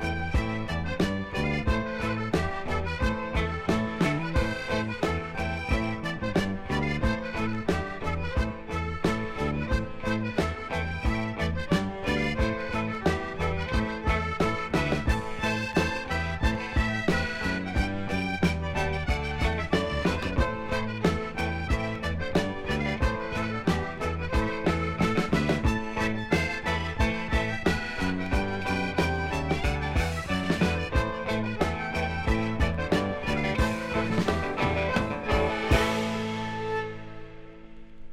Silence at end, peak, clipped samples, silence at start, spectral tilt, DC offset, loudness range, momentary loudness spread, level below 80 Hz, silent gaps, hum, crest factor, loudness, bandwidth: 0 s; -10 dBFS; under 0.1%; 0 s; -6 dB/octave; under 0.1%; 2 LU; 4 LU; -36 dBFS; none; none; 18 dB; -28 LUFS; 15 kHz